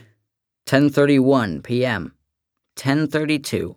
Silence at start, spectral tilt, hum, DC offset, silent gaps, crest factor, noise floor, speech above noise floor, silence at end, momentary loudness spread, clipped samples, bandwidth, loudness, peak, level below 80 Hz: 0.65 s; -6 dB/octave; none; under 0.1%; none; 20 dB; -79 dBFS; 60 dB; 0.05 s; 14 LU; under 0.1%; 17.5 kHz; -19 LUFS; 0 dBFS; -56 dBFS